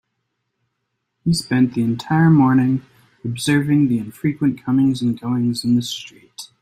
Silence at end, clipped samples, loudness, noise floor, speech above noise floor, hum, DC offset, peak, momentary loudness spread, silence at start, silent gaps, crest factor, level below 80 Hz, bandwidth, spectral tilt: 0.15 s; under 0.1%; -18 LUFS; -75 dBFS; 57 dB; none; under 0.1%; -4 dBFS; 15 LU; 1.25 s; none; 14 dB; -54 dBFS; 15 kHz; -6 dB/octave